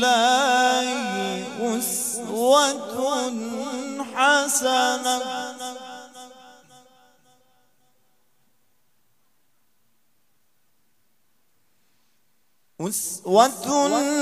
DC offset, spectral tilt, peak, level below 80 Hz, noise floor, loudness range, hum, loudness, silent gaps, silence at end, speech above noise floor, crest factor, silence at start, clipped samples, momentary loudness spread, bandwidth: under 0.1%; -2 dB/octave; -2 dBFS; -80 dBFS; -71 dBFS; 15 LU; none; -22 LUFS; none; 0 s; 50 dB; 24 dB; 0 s; under 0.1%; 16 LU; 15.5 kHz